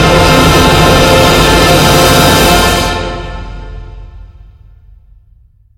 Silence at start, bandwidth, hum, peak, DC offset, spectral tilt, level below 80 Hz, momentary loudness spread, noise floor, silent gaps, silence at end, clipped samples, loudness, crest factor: 0 s; 17.5 kHz; none; 0 dBFS; under 0.1%; -4 dB/octave; -20 dBFS; 19 LU; -44 dBFS; none; 1.55 s; 1%; -6 LUFS; 8 dB